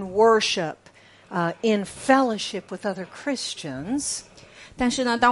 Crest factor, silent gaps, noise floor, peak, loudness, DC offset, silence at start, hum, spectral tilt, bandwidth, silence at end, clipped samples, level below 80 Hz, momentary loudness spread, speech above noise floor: 20 dB; none; -52 dBFS; -4 dBFS; -24 LUFS; under 0.1%; 0 s; none; -3.5 dB/octave; 11.5 kHz; 0 s; under 0.1%; -54 dBFS; 13 LU; 29 dB